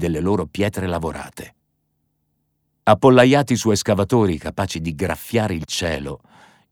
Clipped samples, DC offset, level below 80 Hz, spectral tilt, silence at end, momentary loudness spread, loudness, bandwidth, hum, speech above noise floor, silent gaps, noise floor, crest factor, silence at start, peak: under 0.1%; under 0.1%; -44 dBFS; -5.5 dB/octave; 0.55 s; 16 LU; -19 LUFS; over 20 kHz; none; 52 dB; none; -70 dBFS; 18 dB; 0 s; 0 dBFS